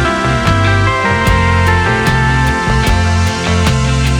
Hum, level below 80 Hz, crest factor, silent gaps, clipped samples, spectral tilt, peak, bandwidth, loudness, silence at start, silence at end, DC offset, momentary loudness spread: none; -20 dBFS; 10 dB; none; under 0.1%; -5.5 dB/octave; 0 dBFS; 16 kHz; -12 LUFS; 0 s; 0 s; under 0.1%; 2 LU